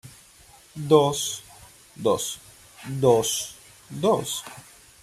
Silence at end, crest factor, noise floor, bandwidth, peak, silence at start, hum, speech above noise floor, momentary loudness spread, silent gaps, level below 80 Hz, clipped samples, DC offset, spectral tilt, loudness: 0.4 s; 22 dB; -52 dBFS; 16 kHz; -4 dBFS; 0.05 s; none; 29 dB; 21 LU; none; -60 dBFS; under 0.1%; under 0.1%; -4.5 dB/octave; -23 LUFS